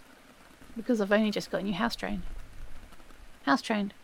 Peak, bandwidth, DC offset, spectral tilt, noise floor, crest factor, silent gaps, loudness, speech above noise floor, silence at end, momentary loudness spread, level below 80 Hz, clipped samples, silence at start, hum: -10 dBFS; 16.5 kHz; under 0.1%; -5 dB/octave; -55 dBFS; 20 dB; none; -30 LUFS; 26 dB; 0 s; 23 LU; -46 dBFS; under 0.1%; 0 s; none